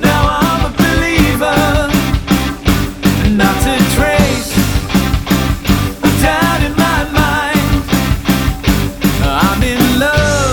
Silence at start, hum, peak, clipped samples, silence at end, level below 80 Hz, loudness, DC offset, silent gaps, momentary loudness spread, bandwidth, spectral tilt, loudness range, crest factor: 0 s; none; 0 dBFS; under 0.1%; 0 s; -20 dBFS; -13 LUFS; 0.5%; none; 3 LU; 19.5 kHz; -5 dB/octave; 1 LU; 12 dB